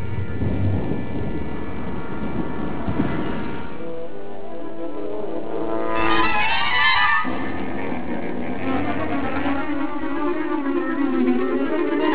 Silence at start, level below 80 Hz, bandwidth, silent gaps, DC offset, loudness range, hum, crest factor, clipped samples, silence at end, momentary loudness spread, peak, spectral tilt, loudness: 0 s; -40 dBFS; 4 kHz; none; 7%; 8 LU; none; 18 dB; under 0.1%; 0 s; 13 LU; -4 dBFS; -9.5 dB/octave; -23 LUFS